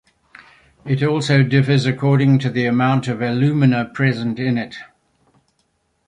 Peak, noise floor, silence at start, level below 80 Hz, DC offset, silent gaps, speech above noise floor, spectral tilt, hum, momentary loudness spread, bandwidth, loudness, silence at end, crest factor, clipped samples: -2 dBFS; -66 dBFS; 0.85 s; -56 dBFS; under 0.1%; none; 50 dB; -7.5 dB/octave; none; 8 LU; 10 kHz; -17 LUFS; 1.25 s; 16 dB; under 0.1%